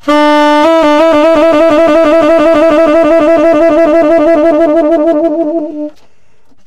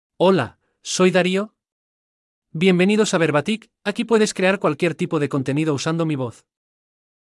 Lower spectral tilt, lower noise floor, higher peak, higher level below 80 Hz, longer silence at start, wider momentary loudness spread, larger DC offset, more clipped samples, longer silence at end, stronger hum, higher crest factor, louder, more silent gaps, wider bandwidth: about the same, -5 dB/octave vs -5.5 dB/octave; second, -52 dBFS vs under -90 dBFS; first, 0 dBFS vs -4 dBFS; first, -38 dBFS vs -68 dBFS; second, 0.05 s vs 0.2 s; second, 5 LU vs 10 LU; neither; neither; second, 0.65 s vs 0.95 s; neither; second, 8 dB vs 16 dB; first, -7 LUFS vs -20 LUFS; second, none vs 1.72-2.42 s; about the same, 11 kHz vs 12 kHz